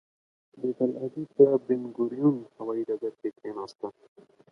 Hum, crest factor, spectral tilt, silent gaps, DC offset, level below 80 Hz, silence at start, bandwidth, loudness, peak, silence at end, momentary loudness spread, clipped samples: none; 22 dB; -9.5 dB/octave; none; under 0.1%; -78 dBFS; 0.55 s; 6.2 kHz; -28 LUFS; -6 dBFS; 0.6 s; 16 LU; under 0.1%